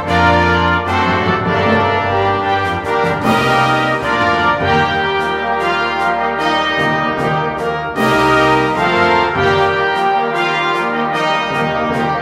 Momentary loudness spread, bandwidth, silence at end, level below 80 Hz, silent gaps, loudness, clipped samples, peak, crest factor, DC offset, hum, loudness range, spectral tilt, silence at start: 4 LU; 16 kHz; 0 s; -38 dBFS; none; -14 LUFS; under 0.1%; 0 dBFS; 14 dB; under 0.1%; none; 1 LU; -5.5 dB/octave; 0 s